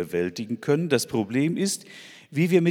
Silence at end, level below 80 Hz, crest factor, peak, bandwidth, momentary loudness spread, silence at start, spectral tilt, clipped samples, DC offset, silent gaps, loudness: 0 s; -66 dBFS; 18 dB; -6 dBFS; 17.5 kHz; 10 LU; 0 s; -5.5 dB/octave; under 0.1%; under 0.1%; none; -25 LUFS